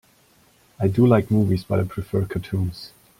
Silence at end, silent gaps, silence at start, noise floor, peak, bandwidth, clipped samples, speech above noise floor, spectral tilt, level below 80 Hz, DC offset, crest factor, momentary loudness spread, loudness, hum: 0.3 s; none; 0.8 s; -57 dBFS; -4 dBFS; 16 kHz; under 0.1%; 37 dB; -9 dB/octave; -48 dBFS; under 0.1%; 18 dB; 10 LU; -22 LUFS; none